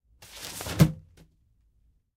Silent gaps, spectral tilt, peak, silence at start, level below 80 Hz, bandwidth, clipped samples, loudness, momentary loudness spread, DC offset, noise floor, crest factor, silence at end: none; -6 dB/octave; -6 dBFS; 0.2 s; -46 dBFS; 16 kHz; under 0.1%; -27 LUFS; 22 LU; under 0.1%; -66 dBFS; 24 dB; 1.2 s